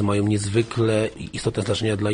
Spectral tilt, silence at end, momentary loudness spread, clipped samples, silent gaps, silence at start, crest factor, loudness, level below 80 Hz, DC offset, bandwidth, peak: -6 dB/octave; 0 s; 6 LU; under 0.1%; none; 0 s; 14 dB; -23 LUFS; -48 dBFS; under 0.1%; 10 kHz; -8 dBFS